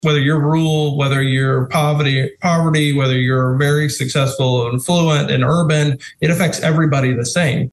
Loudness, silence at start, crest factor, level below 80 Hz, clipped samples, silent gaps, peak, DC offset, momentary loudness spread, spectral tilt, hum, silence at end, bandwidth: -16 LUFS; 0.05 s; 12 dB; -48 dBFS; under 0.1%; none; -4 dBFS; under 0.1%; 3 LU; -5.5 dB/octave; none; 0.05 s; 12.5 kHz